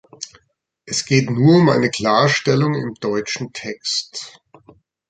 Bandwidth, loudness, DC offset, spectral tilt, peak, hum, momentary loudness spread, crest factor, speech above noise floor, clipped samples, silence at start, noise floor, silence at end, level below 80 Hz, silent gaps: 9.4 kHz; -17 LUFS; under 0.1%; -5 dB/octave; -2 dBFS; none; 19 LU; 18 dB; 48 dB; under 0.1%; 0.2 s; -65 dBFS; 0.8 s; -56 dBFS; none